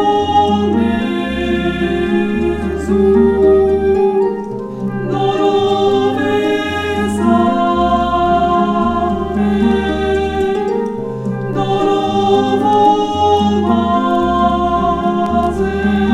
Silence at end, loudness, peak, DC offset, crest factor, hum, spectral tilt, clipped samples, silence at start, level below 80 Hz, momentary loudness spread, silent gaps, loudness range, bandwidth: 0 s; -14 LUFS; 0 dBFS; under 0.1%; 14 dB; none; -7 dB/octave; under 0.1%; 0 s; -32 dBFS; 7 LU; none; 2 LU; 11.5 kHz